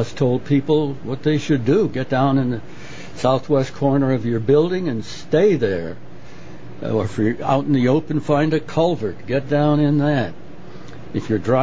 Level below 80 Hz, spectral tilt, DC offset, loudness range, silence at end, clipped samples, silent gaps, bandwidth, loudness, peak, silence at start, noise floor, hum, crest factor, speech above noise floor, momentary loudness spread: -48 dBFS; -7.5 dB/octave; 3%; 2 LU; 0 s; under 0.1%; none; 8 kHz; -19 LUFS; -2 dBFS; 0 s; -39 dBFS; none; 16 dB; 21 dB; 19 LU